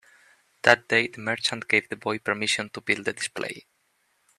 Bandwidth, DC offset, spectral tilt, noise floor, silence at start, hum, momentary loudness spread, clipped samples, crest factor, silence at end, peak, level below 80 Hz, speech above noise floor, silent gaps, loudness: 14 kHz; under 0.1%; -2.5 dB/octave; -70 dBFS; 0.65 s; none; 10 LU; under 0.1%; 26 dB; 0.8 s; 0 dBFS; -70 dBFS; 44 dB; none; -25 LUFS